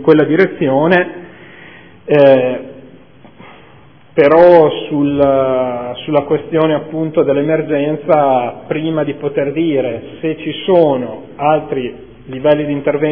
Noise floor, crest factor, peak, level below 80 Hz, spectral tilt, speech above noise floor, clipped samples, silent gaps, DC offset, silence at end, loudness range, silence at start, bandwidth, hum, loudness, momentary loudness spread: -43 dBFS; 14 dB; 0 dBFS; -50 dBFS; -9.5 dB/octave; 30 dB; 0.4%; none; 0.5%; 0 s; 4 LU; 0 s; 5.4 kHz; none; -13 LUFS; 12 LU